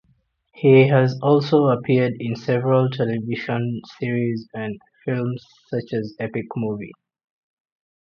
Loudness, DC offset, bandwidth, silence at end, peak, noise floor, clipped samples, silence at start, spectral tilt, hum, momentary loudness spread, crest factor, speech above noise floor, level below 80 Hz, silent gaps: -21 LUFS; under 0.1%; 6.6 kHz; 1.1 s; -2 dBFS; -64 dBFS; under 0.1%; 0.55 s; -9 dB/octave; none; 14 LU; 18 dB; 44 dB; -62 dBFS; none